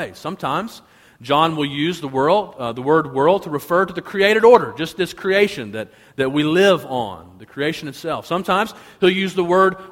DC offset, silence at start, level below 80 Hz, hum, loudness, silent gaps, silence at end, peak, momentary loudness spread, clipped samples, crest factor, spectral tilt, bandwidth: under 0.1%; 0 s; -56 dBFS; none; -18 LUFS; none; 0 s; 0 dBFS; 13 LU; under 0.1%; 18 dB; -5.5 dB/octave; 16.5 kHz